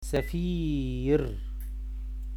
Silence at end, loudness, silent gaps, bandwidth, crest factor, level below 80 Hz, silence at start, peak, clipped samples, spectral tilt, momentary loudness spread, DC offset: 0 s; -31 LUFS; none; 14 kHz; 16 dB; -34 dBFS; 0 s; -14 dBFS; under 0.1%; -7 dB/octave; 12 LU; under 0.1%